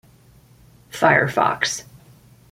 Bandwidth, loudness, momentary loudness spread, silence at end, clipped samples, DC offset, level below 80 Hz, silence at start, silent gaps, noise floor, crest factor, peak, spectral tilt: 16.5 kHz; -19 LUFS; 14 LU; 0.7 s; under 0.1%; under 0.1%; -56 dBFS; 0.95 s; none; -51 dBFS; 20 dB; -2 dBFS; -3.5 dB/octave